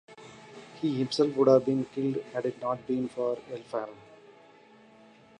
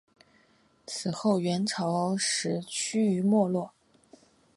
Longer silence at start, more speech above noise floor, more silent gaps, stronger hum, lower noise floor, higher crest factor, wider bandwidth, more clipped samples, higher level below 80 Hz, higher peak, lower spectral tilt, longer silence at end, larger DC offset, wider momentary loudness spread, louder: second, 0.1 s vs 0.9 s; second, 28 dB vs 37 dB; neither; neither; second, -56 dBFS vs -65 dBFS; about the same, 20 dB vs 16 dB; about the same, 10.5 kHz vs 11.5 kHz; neither; about the same, -72 dBFS vs -74 dBFS; about the same, -10 dBFS vs -12 dBFS; first, -7 dB/octave vs -4.5 dB/octave; first, 1.25 s vs 0.9 s; neither; first, 25 LU vs 9 LU; about the same, -29 LUFS vs -28 LUFS